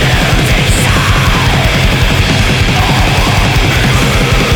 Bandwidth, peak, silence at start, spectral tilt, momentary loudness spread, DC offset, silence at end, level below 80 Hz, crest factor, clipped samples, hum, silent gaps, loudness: over 20 kHz; 0 dBFS; 0 s; -4.5 dB/octave; 1 LU; under 0.1%; 0 s; -16 dBFS; 8 dB; under 0.1%; none; none; -9 LUFS